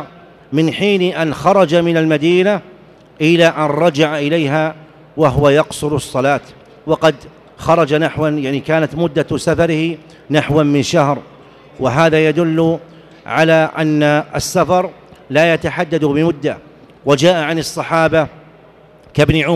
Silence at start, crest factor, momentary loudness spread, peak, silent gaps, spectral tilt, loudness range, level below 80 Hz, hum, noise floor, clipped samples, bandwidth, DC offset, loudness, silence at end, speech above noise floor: 0 s; 14 dB; 9 LU; -2 dBFS; none; -6 dB/octave; 3 LU; -42 dBFS; none; -44 dBFS; under 0.1%; 14 kHz; under 0.1%; -14 LUFS; 0 s; 30 dB